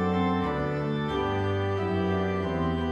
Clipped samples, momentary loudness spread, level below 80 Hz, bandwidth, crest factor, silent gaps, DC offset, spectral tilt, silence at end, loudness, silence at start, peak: under 0.1%; 3 LU; -46 dBFS; 8.4 kHz; 12 dB; none; under 0.1%; -8 dB/octave; 0 s; -28 LUFS; 0 s; -14 dBFS